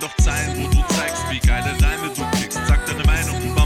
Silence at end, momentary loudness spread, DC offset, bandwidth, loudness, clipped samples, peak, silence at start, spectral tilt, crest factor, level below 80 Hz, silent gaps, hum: 0 s; 4 LU; under 0.1%; 16.5 kHz; -20 LUFS; under 0.1%; -4 dBFS; 0 s; -4.5 dB/octave; 14 dB; -20 dBFS; none; none